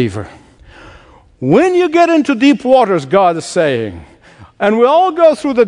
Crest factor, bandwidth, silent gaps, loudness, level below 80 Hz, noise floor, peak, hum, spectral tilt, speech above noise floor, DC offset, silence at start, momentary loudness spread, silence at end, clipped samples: 12 dB; 10.5 kHz; none; -11 LUFS; -50 dBFS; -42 dBFS; 0 dBFS; none; -6 dB/octave; 31 dB; under 0.1%; 0 s; 10 LU; 0 s; 0.1%